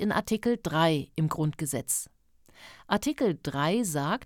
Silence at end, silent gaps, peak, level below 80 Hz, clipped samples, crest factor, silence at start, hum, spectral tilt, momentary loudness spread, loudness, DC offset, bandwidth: 0 s; none; -12 dBFS; -58 dBFS; under 0.1%; 18 dB; 0 s; none; -4.5 dB/octave; 5 LU; -28 LUFS; under 0.1%; 18 kHz